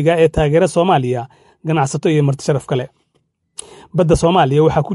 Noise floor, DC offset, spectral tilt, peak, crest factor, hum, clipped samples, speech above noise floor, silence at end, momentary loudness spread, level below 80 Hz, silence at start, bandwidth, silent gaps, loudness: -64 dBFS; under 0.1%; -6.5 dB/octave; -2 dBFS; 14 dB; none; under 0.1%; 50 dB; 0 s; 20 LU; -36 dBFS; 0 s; 11.5 kHz; none; -15 LUFS